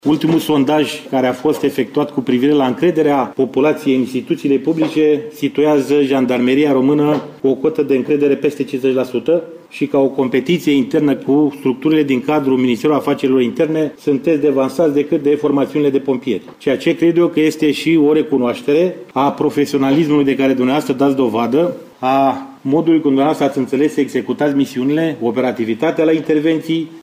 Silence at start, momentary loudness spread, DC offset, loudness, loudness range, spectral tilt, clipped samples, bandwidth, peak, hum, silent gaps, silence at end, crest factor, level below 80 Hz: 0.05 s; 5 LU; under 0.1%; -15 LUFS; 1 LU; -6.5 dB/octave; under 0.1%; 15.5 kHz; -4 dBFS; none; none; 0 s; 10 dB; -60 dBFS